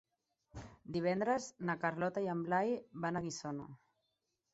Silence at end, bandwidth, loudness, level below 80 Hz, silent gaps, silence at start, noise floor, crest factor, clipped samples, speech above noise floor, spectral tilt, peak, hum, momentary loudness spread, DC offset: 0.75 s; 8 kHz; -38 LUFS; -70 dBFS; none; 0.55 s; -85 dBFS; 18 dB; under 0.1%; 48 dB; -5.5 dB/octave; -20 dBFS; none; 18 LU; under 0.1%